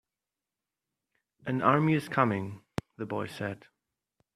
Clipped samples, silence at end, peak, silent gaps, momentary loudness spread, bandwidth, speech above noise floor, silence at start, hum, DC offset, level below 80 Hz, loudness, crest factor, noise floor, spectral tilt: under 0.1%; 0.8 s; -8 dBFS; none; 15 LU; 14 kHz; over 61 dB; 1.45 s; none; under 0.1%; -66 dBFS; -29 LUFS; 24 dB; under -90 dBFS; -7.5 dB/octave